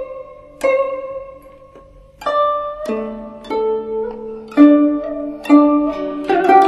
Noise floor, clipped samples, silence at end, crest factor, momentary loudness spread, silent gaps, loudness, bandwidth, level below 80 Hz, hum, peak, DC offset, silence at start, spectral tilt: -43 dBFS; under 0.1%; 0 s; 16 dB; 19 LU; none; -16 LUFS; 11 kHz; -50 dBFS; none; 0 dBFS; under 0.1%; 0 s; -6 dB/octave